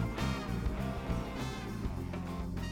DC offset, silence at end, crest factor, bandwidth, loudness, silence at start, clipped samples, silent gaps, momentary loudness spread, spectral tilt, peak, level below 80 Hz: under 0.1%; 0 s; 14 dB; 18 kHz; -38 LUFS; 0 s; under 0.1%; none; 4 LU; -6.5 dB/octave; -22 dBFS; -42 dBFS